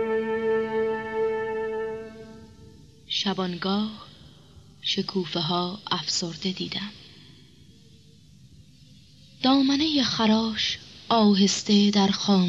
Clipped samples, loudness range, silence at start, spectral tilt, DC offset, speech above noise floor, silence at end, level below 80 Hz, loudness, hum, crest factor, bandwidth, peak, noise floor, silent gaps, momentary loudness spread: under 0.1%; 9 LU; 0 s; -4.5 dB/octave; under 0.1%; 30 dB; 0 s; -60 dBFS; -24 LUFS; none; 16 dB; 8 kHz; -10 dBFS; -53 dBFS; none; 13 LU